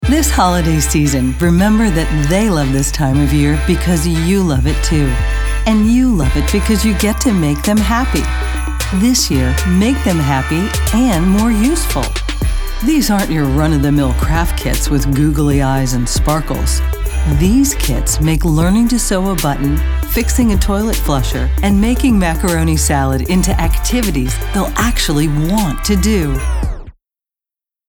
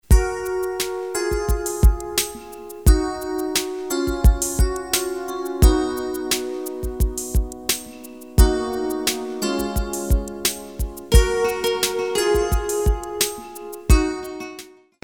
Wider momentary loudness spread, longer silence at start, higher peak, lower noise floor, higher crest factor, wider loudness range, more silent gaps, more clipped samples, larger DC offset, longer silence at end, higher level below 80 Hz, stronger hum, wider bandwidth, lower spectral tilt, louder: second, 5 LU vs 11 LU; about the same, 0 s vs 0.1 s; about the same, -2 dBFS vs -2 dBFS; first, -87 dBFS vs -42 dBFS; second, 12 dB vs 20 dB; about the same, 2 LU vs 2 LU; neither; neither; second, under 0.1% vs 0.2%; first, 1 s vs 0.35 s; about the same, -18 dBFS vs -22 dBFS; neither; about the same, 20 kHz vs 19.5 kHz; about the same, -5 dB/octave vs -4.5 dB/octave; first, -14 LUFS vs -22 LUFS